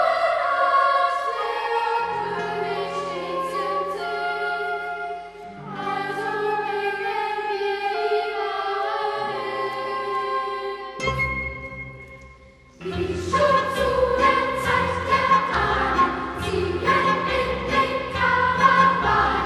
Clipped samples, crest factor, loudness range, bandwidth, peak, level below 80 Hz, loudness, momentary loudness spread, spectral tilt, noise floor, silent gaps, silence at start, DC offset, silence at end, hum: under 0.1%; 20 dB; 7 LU; 13 kHz; -2 dBFS; -44 dBFS; -23 LUFS; 10 LU; -5 dB/octave; -48 dBFS; none; 0 s; under 0.1%; 0 s; none